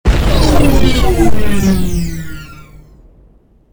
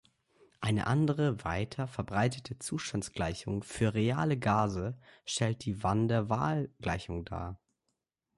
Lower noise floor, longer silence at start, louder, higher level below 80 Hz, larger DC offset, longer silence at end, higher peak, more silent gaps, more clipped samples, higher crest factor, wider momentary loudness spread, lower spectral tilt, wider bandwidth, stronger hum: second, -46 dBFS vs -84 dBFS; second, 0.05 s vs 0.6 s; first, -13 LUFS vs -33 LUFS; first, -16 dBFS vs -52 dBFS; neither; second, 0 s vs 0.8 s; first, 0 dBFS vs -14 dBFS; neither; first, 0.1% vs under 0.1%; second, 12 dB vs 18 dB; first, 17 LU vs 10 LU; about the same, -6 dB/octave vs -6 dB/octave; first, over 20 kHz vs 11.5 kHz; neither